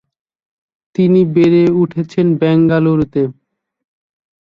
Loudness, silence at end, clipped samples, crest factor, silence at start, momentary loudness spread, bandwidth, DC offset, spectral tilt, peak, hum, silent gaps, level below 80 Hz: -13 LUFS; 1.1 s; under 0.1%; 12 dB; 1 s; 8 LU; 7 kHz; under 0.1%; -9.5 dB/octave; -2 dBFS; none; none; -50 dBFS